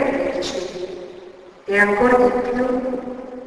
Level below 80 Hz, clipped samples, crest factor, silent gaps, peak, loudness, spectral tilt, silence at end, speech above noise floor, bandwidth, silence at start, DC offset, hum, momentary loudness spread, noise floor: -48 dBFS; under 0.1%; 18 dB; none; -2 dBFS; -19 LUFS; -5 dB/octave; 0 s; 24 dB; 11 kHz; 0 s; under 0.1%; none; 20 LU; -41 dBFS